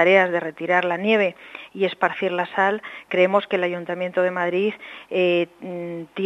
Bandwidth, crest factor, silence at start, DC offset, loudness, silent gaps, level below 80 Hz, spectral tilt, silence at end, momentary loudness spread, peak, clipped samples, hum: 7.8 kHz; 20 dB; 0 s; under 0.1%; -22 LUFS; none; -72 dBFS; -6.5 dB/octave; 0 s; 12 LU; -2 dBFS; under 0.1%; none